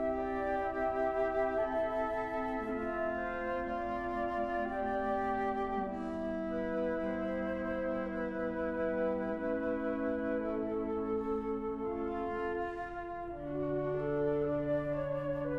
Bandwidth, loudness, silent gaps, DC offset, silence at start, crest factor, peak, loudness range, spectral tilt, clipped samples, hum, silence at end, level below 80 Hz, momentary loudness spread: 8.4 kHz; -35 LUFS; none; under 0.1%; 0 s; 12 dB; -22 dBFS; 2 LU; -8.5 dB/octave; under 0.1%; none; 0 s; -54 dBFS; 4 LU